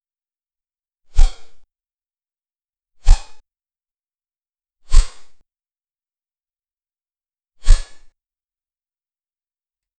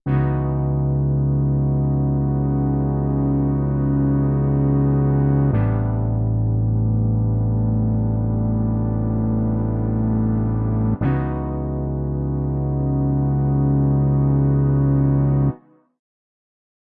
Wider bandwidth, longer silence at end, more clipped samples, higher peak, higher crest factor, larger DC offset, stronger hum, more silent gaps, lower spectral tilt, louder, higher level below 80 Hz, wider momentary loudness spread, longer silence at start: first, 9 kHz vs 2.7 kHz; first, 2.15 s vs 1.4 s; neither; first, 0 dBFS vs -6 dBFS; first, 20 dB vs 12 dB; neither; neither; neither; second, -3.5 dB/octave vs -15 dB/octave; second, -23 LUFS vs -20 LUFS; first, -20 dBFS vs -30 dBFS; first, 11 LU vs 4 LU; first, 1.15 s vs 0.05 s